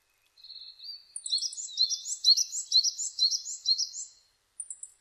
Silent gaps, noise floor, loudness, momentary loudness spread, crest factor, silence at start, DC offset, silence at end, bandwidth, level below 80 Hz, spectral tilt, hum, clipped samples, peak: none; -64 dBFS; -26 LUFS; 21 LU; 20 dB; 0.45 s; under 0.1%; 0.15 s; 13 kHz; -82 dBFS; 7 dB/octave; none; under 0.1%; -12 dBFS